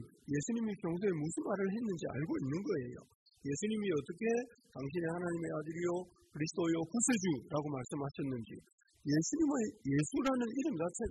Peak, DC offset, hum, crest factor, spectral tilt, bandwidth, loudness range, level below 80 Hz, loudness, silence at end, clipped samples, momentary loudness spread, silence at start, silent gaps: -22 dBFS; under 0.1%; none; 16 dB; -5.5 dB/octave; 12 kHz; 2 LU; -66 dBFS; -37 LUFS; 0 s; under 0.1%; 9 LU; 0 s; 3.15-3.26 s, 8.73-8.78 s